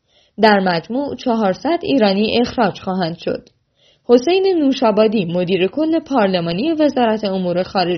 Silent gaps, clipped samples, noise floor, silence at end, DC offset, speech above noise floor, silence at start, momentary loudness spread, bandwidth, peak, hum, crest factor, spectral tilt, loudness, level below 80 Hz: none; under 0.1%; -57 dBFS; 0 s; under 0.1%; 41 dB; 0.4 s; 8 LU; 6.4 kHz; 0 dBFS; none; 16 dB; -4.5 dB/octave; -16 LUFS; -54 dBFS